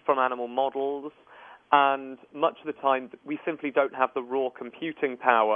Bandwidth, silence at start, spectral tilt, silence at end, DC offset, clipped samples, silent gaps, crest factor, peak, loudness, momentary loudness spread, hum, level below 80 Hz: 3.7 kHz; 0.05 s; -7.5 dB/octave; 0 s; under 0.1%; under 0.1%; none; 22 dB; -4 dBFS; -27 LUFS; 13 LU; none; -80 dBFS